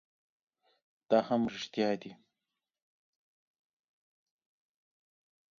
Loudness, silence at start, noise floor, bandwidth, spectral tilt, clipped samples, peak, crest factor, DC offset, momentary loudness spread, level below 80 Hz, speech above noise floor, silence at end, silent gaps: -32 LUFS; 1.1 s; -90 dBFS; 7.2 kHz; -4 dB/octave; under 0.1%; -12 dBFS; 26 dB; under 0.1%; 10 LU; -78 dBFS; 58 dB; 3.45 s; none